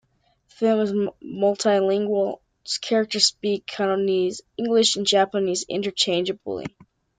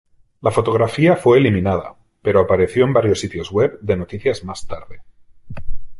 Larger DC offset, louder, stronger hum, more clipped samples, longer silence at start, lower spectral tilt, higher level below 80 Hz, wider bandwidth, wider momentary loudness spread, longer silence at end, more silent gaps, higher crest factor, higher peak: neither; second, -22 LUFS vs -17 LUFS; neither; neither; first, 0.6 s vs 0.45 s; second, -3.5 dB/octave vs -7 dB/octave; second, -66 dBFS vs -38 dBFS; second, 9.6 kHz vs 11.5 kHz; second, 10 LU vs 20 LU; first, 0.5 s vs 0 s; neither; about the same, 20 dB vs 16 dB; about the same, -4 dBFS vs -2 dBFS